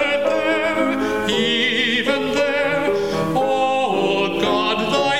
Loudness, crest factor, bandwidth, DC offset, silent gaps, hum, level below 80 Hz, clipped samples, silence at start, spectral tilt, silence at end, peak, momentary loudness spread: -18 LUFS; 14 dB; 16.5 kHz; 0.7%; none; none; -50 dBFS; under 0.1%; 0 s; -4 dB/octave; 0 s; -4 dBFS; 3 LU